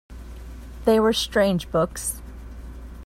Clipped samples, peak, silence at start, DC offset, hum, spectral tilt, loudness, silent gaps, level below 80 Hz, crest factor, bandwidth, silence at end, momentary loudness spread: under 0.1%; -6 dBFS; 0.1 s; under 0.1%; none; -4.5 dB/octave; -22 LUFS; none; -38 dBFS; 18 dB; 16 kHz; 0 s; 21 LU